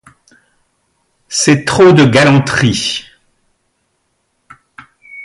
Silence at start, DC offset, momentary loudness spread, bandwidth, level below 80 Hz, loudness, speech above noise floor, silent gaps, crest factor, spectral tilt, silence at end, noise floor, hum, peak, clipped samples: 1.3 s; under 0.1%; 12 LU; 11.5 kHz; -44 dBFS; -10 LUFS; 55 dB; none; 14 dB; -5 dB/octave; 0 s; -64 dBFS; none; 0 dBFS; under 0.1%